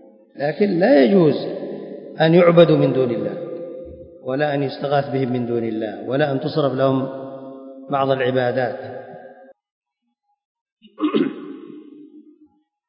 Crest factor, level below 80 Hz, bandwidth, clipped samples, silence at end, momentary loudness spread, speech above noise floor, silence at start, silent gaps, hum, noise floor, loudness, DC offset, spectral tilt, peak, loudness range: 20 dB; -62 dBFS; 5.4 kHz; under 0.1%; 0.65 s; 22 LU; 56 dB; 0.35 s; 9.71-9.81 s, 10.45-10.55 s, 10.61-10.66 s, 10.72-10.77 s; none; -74 dBFS; -19 LUFS; under 0.1%; -10.5 dB/octave; 0 dBFS; 13 LU